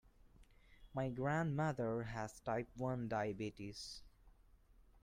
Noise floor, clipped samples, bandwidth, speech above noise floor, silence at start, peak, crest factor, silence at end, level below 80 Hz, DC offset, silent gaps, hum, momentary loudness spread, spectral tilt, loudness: -67 dBFS; under 0.1%; 15.5 kHz; 26 dB; 0.25 s; -26 dBFS; 18 dB; 0.2 s; -64 dBFS; under 0.1%; none; none; 11 LU; -6.5 dB/octave; -42 LUFS